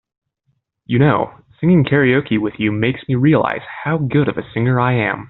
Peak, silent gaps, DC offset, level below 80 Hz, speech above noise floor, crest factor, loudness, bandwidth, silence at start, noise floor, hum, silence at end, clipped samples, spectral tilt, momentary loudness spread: -2 dBFS; none; under 0.1%; -50 dBFS; 52 dB; 14 dB; -16 LUFS; 4.2 kHz; 0.9 s; -67 dBFS; none; 0.05 s; under 0.1%; -6.5 dB/octave; 7 LU